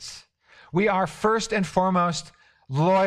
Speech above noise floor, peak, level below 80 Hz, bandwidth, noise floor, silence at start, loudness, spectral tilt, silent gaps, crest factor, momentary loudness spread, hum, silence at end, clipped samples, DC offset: 32 dB; -8 dBFS; -54 dBFS; 12 kHz; -55 dBFS; 0 s; -24 LUFS; -5.5 dB/octave; none; 16 dB; 11 LU; none; 0 s; under 0.1%; under 0.1%